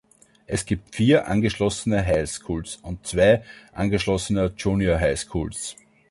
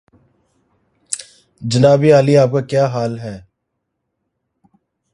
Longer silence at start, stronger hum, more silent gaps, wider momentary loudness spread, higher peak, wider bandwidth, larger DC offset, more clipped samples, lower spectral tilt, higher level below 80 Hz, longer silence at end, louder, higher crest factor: second, 0.5 s vs 1.1 s; neither; neither; second, 12 LU vs 18 LU; second, -6 dBFS vs 0 dBFS; about the same, 11.5 kHz vs 11.5 kHz; neither; neither; about the same, -5.5 dB/octave vs -6.5 dB/octave; first, -40 dBFS vs -54 dBFS; second, 0.4 s vs 1.75 s; second, -23 LUFS vs -14 LUFS; about the same, 18 dB vs 18 dB